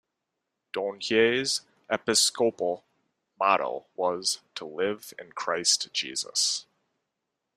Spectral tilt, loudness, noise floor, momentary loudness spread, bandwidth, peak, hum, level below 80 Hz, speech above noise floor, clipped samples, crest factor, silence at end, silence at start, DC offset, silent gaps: -1 dB/octave; -26 LUFS; -83 dBFS; 11 LU; 15.5 kHz; -6 dBFS; none; -74 dBFS; 56 dB; under 0.1%; 22 dB; 0.95 s; 0.75 s; under 0.1%; none